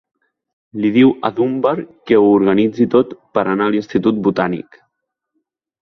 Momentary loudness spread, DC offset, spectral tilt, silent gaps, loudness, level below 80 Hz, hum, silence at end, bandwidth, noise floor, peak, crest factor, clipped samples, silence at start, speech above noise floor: 8 LU; under 0.1%; -8.5 dB/octave; none; -15 LUFS; -56 dBFS; none; 1.35 s; 6.4 kHz; -75 dBFS; 0 dBFS; 16 dB; under 0.1%; 0.75 s; 60 dB